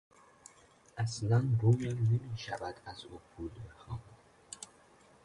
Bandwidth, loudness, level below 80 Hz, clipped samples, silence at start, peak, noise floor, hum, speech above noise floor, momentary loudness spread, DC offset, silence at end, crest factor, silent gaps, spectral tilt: 11 kHz; -33 LUFS; -60 dBFS; under 0.1%; 0.95 s; -18 dBFS; -62 dBFS; none; 30 dB; 21 LU; under 0.1%; 0.6 s; 18 dB; none; -6.5 dB/octave